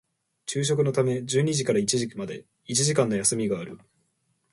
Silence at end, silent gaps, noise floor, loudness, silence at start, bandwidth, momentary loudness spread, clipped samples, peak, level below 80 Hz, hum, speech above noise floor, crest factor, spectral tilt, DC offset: 0.75 s; none; -72 dBFS; -25 LUFS; 0.45 s; 11.5 kHz; 14 LU; under 0.1%; -8 dBFS; -64 dBFS; none; 47 dB; 20 dB; -4.5 dB/octave; under 0.1%